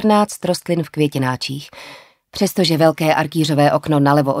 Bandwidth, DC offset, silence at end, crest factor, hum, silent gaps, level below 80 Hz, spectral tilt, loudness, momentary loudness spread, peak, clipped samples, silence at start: 16 kHz; under 0.1%; 0 s; 16 dB; none; none; -56 dBFS; -5.5 dB/octave; -17 LUFS; 16 LU; 0 dBFS; under 0.1%; 0 s